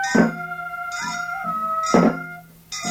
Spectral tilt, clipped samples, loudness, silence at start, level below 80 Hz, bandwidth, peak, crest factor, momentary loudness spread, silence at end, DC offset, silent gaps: -5 dB/octave; under 0.1%; -22 LUFS; 0 s; -54 dBFS; 16.5 kHz; -4 dBFS; 18 dB; 14 LU; 0 s; under 0.1%; none